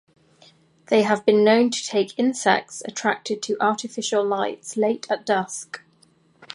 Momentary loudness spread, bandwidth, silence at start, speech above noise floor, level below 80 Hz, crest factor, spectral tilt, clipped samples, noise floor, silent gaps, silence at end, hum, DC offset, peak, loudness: 10 LU; 11.5 kHz; 0.9 s; 37 dB; -72 dBFS; 20 dB; -3.5 dB/octave; under 0.1%; -59 dBFS; none; 0 s; none; under 0.1%; -4 dBFS; -22 LUFS